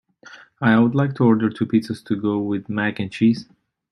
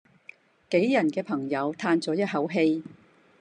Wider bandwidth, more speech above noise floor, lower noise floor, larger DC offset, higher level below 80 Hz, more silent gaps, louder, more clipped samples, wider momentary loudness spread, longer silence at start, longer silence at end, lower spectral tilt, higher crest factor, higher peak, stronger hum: about the same, 10.5 kHz vs 9.8 kHz; about the same, 27 dB vs 28 dB; second, -46 dBFS vs -53 dBFS; neither; first, -62 dBFS vs -78 dBFS; neither; first, -20 LUFS vs -26 LUFS; neither; about the same, 8 LU vs 6 LU; second, 0.3 s vs 0.7 s; about the same, 0.5 s vs 0.45 s; first, -8 dB/octave vs -6.5 dB/octave; about the same, 18 dB vs 18 dB; first, -2 dBFS vs -10 dBFS; neither